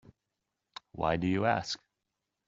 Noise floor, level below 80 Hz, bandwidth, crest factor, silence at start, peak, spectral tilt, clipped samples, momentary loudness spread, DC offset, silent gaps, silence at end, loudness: -86 dBFS; -60 dBFS; 7.8 kHz; 22 dB; 0.95 s; -12 dBFS; -4.5 dB/octave; under 0.1%; 21 LU; under 0.1%; none; 0.7 s; -32 LUFS